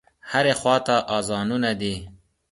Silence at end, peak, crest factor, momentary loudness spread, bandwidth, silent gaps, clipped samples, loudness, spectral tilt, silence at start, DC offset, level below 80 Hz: 0.35 s; -6 dBFS; 18 dB; 8 LU; 11.5 kHz; none; under 0.1%; -22 LUFS; -4 dB/octave; 0.25 s; under 0.1%; -52 dBFS